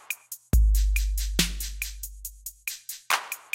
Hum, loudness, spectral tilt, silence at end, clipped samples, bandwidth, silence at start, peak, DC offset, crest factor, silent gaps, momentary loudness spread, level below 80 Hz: none; -28 LUFS; -3 dB/octave; 0.15 s; under 0.1%; 17 kHz; 0.1 s; -8 dBFS; under 0.1%; 18 dB; none; 13 LU; -28 dBFS